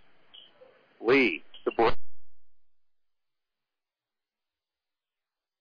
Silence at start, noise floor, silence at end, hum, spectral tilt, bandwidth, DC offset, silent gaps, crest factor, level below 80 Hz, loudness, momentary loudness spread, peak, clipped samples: 0 s; under -90 dBFS; 0 s; none; -6.5 dB/octave; 5.2 kHz; under 0.1%; none; 16 dB; -52 dBFS; -26 LUFS; 11 LU; -14 dBFS; under 0.1%